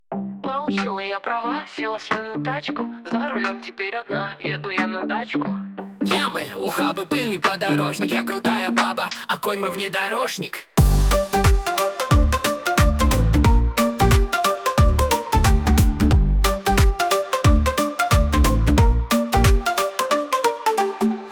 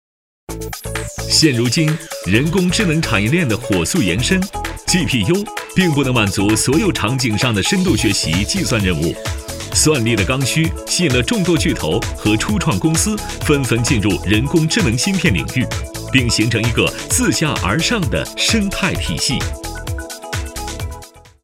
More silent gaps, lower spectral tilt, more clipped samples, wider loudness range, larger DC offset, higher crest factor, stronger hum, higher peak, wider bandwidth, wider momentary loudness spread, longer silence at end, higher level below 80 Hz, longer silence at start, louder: neither; about the same, -5 dB/octave vs -4 dB/octave; neither; first, 7 LU vs 1 LU; neither; about the same, 14 dB vs 16 dB; neither; second, -6 dBFS vs 0 dBFS; first, 19.5 kHz vs 17 kHz; about the same, 9 LU vs 10 LU; second, 0 s vs 0.25 s; first, -24 dBFS vs -32 dBFS; second, 0.1 s vs 0.5 s; second, -21 LUFS vs -16 LUFS